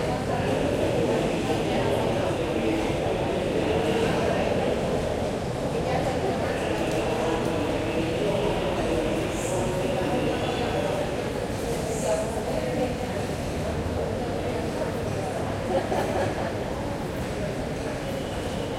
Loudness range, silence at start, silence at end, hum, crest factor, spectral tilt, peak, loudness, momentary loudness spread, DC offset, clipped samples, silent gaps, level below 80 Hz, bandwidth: 3 LU; 0 s; 0 s; none; 14 dB; -5.5 dB/octave; -12 dBFS; -27 LUFS; 5 LU; under 0.1%; under 0.1%; none; -42 dBFS; 16.5 kHz